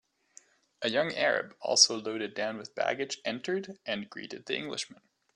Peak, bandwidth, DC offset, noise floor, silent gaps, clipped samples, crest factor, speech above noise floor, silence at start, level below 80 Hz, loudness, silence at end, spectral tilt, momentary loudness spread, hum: -6 dBFS; 11 kHz; under 0.1%; -60 dBFS; none; under 0.1%; 26 dB; 29 dB; 0.8 s; -78 dBFS; -30 LUFS; 0.45 s; -1.5 dB/octave; 14 LU; none